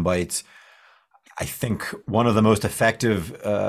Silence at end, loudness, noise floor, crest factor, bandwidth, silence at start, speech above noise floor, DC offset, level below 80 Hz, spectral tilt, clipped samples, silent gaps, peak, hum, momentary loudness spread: 0 s; -23 LUFS; -56 dBFS; 18 dB; 16 kHz; 0 s; 34 dB; under 0.1%; -44 dBFS; -5.5 dB/octave; under 0.1%; none; -4 dBFS; none; 12 LU